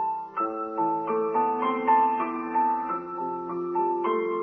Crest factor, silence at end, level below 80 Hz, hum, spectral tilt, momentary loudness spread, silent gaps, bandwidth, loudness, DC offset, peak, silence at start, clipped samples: 16 dB; 0 s; -72 dBFS; none; -8.5 dB/octave; 9 LU; none; 3.4 kHz; -26 LUFS; under 0.1%; -10 dBFS; 0 s; under 0.1%